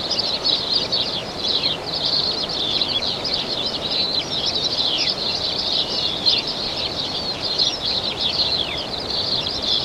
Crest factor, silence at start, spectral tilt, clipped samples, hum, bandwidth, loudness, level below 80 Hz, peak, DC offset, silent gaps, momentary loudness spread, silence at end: 18 dB; 0 s; -2.5 dB/octave; under 0.1%; none; 16.5 kHz; -19 LUFS; -46 dBFS; -4 dBFS; under 0.1%; none; 5 LU; 0 s